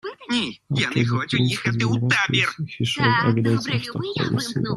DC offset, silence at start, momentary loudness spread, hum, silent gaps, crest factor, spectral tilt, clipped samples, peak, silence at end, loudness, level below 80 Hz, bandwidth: under 0.1%; 0.05 s; 7 LU; none; none; 18 dB; -5 dB/octave; under 0.1%; -4 dBFS; 0 s; -22 LUFS; -56 dBFS; 12 kHz